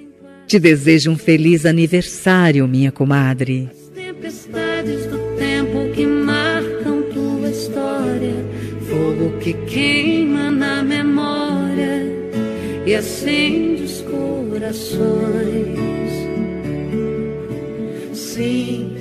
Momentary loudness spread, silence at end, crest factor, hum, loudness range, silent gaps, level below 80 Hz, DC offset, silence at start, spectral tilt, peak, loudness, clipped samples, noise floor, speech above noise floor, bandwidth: 11 LU; 0 s; 18 dB; none; 7 LU; none; -46 dBFS; under 0.1%; 0 s; -6 dB/octave; 0 dBFS; -18 LUFS; under 0.1%; -39 dBFS; 24 dB; 14.5 kHz